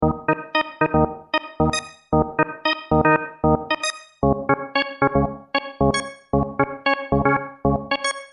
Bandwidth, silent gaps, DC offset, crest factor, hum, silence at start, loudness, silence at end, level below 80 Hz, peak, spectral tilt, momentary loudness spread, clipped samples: 10.5 kHz; none; under 0.1%; 18 dB; none; 0 s; -22 LUFS; 0.05 s; -38 dBFS; -4 dBFS; -5.5 dB/octave; 4 LU; under 0.1%